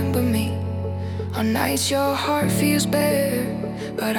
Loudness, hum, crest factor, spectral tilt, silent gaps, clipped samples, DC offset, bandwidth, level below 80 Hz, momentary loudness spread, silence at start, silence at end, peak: -22 LUFS; none; 16 dB; -5 dB/octave; none; under 0.1%; under 0.1%; 18 kHz; -52 dBFS; 8 LU; 0 s; 0 s; -6 dBFS